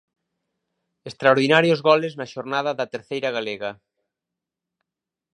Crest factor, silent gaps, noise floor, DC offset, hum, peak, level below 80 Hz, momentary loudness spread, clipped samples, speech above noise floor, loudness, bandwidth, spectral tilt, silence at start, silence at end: 22 dB; none; -87 dBFS; under 0.1%; none; 0 dBFS; -72 dBFS; 15 LU; under 0.1%; 66 dB; -21 LUFS; 10.5 kHz; -5.5 dB/octave; 1.05 s; 1.6 s